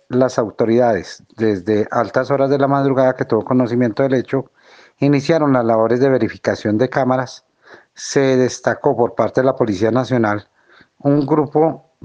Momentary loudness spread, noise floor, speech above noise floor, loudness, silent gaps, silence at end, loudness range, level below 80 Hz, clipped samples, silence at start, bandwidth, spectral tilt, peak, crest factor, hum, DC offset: 6 LU; -51 dBFS; 35 dB; -17 LUFS; none; 0.25 s; 1 LU; -60 dBFS; under 0.1%; 0.1 s; 9 kHz; -6.5 dB/octave; 0 dBFS; 16 dB; none; under 0.1%